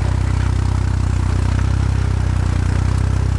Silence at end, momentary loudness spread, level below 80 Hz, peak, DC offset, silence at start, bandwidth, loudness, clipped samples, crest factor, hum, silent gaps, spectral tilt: 0 s; 1 LU; -20 dBFS; -6 dBFS; under 0.1%; 0 s; 11 kHz; -18 LUFS; under 0.1%; 10 dB; none; none; -7 dB/octave